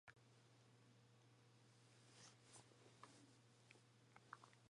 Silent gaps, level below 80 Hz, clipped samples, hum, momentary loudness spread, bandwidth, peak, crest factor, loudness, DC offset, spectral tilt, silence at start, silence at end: none; under -90 dBFS; under 0.1%; none; 5 LU; 11 kHz; -38 dBFS; 30 dB; -66 LUFS; under 0.1%; -3.5 dB/octave; 0.05 s; 0 s